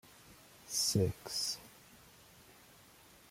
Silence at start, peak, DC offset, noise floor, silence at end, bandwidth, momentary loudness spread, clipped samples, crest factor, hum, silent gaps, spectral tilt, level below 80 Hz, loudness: 0.3 s; -20 dBFS; under 0.1%; -61 dBFS; 1.35 s; 16.5 kHz; 26 LU; under 0.1%; 20 dB; none; none; -3.5 dB/octave; -68 dBFS; -35 LUFS